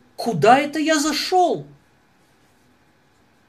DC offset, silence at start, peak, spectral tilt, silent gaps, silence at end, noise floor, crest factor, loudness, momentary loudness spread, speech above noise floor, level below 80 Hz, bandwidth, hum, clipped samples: under 0.1%; 0.2 s; -2 dBFS; -4 dB/octave; none; 1.85 s; -59 dBFS; 20 dB; -18 LUFS; 9 LU; 41 dB; -62 dBFS; 15 kHz; none; under 0.1%